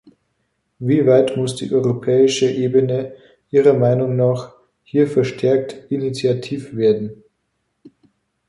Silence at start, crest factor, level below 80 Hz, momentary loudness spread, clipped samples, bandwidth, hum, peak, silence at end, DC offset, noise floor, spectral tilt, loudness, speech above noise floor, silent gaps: 0.8 s; 16 dB; -60 dBFS; 11 LU; under 0.1%; 11.5 kHz; none; -2 dBFS; 0.6 s; under 0.1%; -71 dBFS; -6.5 dB/octave; -18 LUFS; 54 dB; none